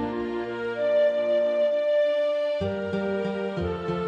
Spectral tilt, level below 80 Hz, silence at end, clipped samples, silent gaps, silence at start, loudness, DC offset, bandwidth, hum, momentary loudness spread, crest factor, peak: -7.5 dB/octave; -52 dBFS; 0 s; under 0.1%; none; 0 s; -25 LUFS; under 0.1%; 7.4 kHz; none; 7 LU; 10 dB; -14 dBFS